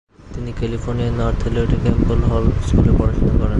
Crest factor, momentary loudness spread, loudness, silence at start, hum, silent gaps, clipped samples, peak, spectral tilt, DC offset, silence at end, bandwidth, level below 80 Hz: 16 dB; 9 LU; -18 LUFS; 0.25 s; none; none; under 0.1%; 0 dBFS; -8.5 dB/octave; under 0.1%; 0 s; 8.8 kHz; -20 dBFS